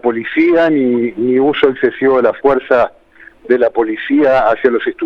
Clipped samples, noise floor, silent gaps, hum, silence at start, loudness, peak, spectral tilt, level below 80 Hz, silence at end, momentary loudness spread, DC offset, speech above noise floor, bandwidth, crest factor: under 0.1%; -39 dBFS; none; none; 0.05 s; -13 LUFS; 0 dBFS; -7.5 dB/octave; -46 dBFS; 0 s; 4 LU; under 0.1%; 27 dB; 5.8 kHz; 12 dB